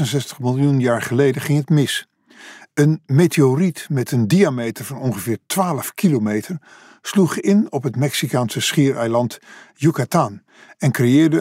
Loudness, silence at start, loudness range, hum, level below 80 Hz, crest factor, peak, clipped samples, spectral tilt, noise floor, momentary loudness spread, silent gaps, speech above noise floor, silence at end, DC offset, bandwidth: -18 LUFS; 0 s; 2 LU; none; -66 dBFS; 16 dB; -4 dBFS; under 0.1%; -6 dB/octave; -43 dBFS; 9 LU; none; 25 dB; 0 s; under 0.1%; 16 kHz